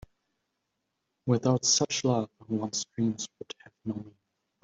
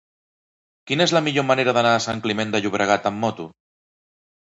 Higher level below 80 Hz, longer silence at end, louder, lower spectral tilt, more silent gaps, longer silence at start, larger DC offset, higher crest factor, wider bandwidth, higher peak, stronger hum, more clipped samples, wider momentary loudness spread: second, -66 dBFS vs -60 dBFS; second, 0.55 s vs 1.1 s; second, -29 LUFS vs -20 LUFS; about the same, -4 dB/octave vs -4.5 dB/octave; neither; first, 1.25 s vs 0.85 s; neither; about the same, 22 dB vs 20 dB; about the same, 8.2 kHz vs 8.2 kHz; second, -8 dBFS vs -4 dBFS; neither; neither; first, 16 LU vs 8 LU